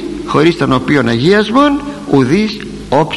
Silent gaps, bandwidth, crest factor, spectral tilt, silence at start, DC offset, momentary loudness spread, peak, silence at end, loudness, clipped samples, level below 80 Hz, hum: none; 12 kHz; 12 dB; -6.5 dB/octave; 0 s; under 0.1%; 7 LU; 0 dBFS; 0 s; -12 LUFS; under 0.1%; -38 dBFS; none